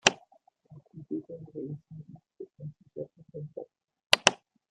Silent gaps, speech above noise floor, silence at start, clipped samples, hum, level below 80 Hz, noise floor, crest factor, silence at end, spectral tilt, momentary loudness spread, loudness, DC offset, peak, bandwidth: 4.06-4.10 s; 21 dB; 0.05 s; under 0.1%; none; -74 dBFS; -64 dBFS; 32 dB; 0.35 s; -2 dB/octave; 27 LU; -28 LUFS; under 0.1%; 0 dBFS; 15 kHz